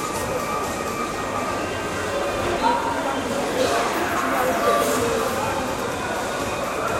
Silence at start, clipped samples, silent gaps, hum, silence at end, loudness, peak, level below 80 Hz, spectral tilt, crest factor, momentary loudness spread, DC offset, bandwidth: 0 s; under 0.1%; none; none; 0 s; -23 LUFS; -8 dBFS; -44 dBFS; -3.5 dB/octave; 16 dB; 6 LU; under 0.1%; 16 kHz